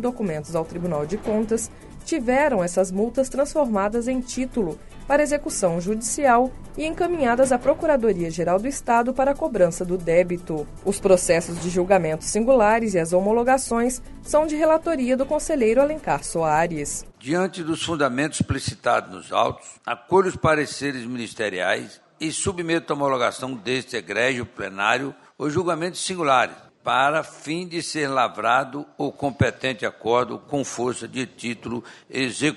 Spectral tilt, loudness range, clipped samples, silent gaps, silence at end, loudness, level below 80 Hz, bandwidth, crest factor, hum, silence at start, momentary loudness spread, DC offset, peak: -4.5 dB/octave; 4 LU; under 0.1%; none; 0 s; -23 LUFS; -44 dBFS; 11.5 kHz; 20 dB; none; 0 s; 10 LU; under 0.1%; -4 dBFS